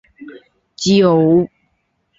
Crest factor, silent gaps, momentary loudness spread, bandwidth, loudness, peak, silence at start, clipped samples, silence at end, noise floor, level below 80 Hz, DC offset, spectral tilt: 14 dB; none; 10 LU; 7.8 kHz; -14 LUFS; -2 dBFS; 0.2 s; under 0.1%; 0.7 s; -66 dBFS; -54 dBFS; under 0.1%; -6 dB/octave